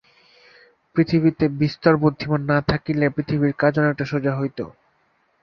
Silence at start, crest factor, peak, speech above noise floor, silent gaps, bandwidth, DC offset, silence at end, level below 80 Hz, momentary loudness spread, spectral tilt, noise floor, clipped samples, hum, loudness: 0.95 s; 20 dB; -2 dBFS; 45 dB; none; 6.4 kHz; under 0.1%; 0.75 s; -48 dBFS; 8 LU; -9 dB/octave; -64 dBFS; under 0.1%; none; -21 LUFS